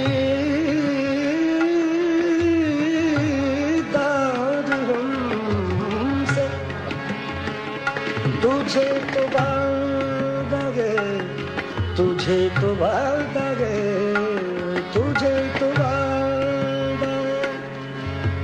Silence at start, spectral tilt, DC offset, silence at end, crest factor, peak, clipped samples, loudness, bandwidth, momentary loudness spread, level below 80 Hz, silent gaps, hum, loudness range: 0 s; -6.5 dB/octave; under 0.1%; 0 s; 14 dB; -6 dBFS; under 0.1%; -22 LUFS; 9.8 kHz; 7 LU; -46 dBFS; none; none; 3 LU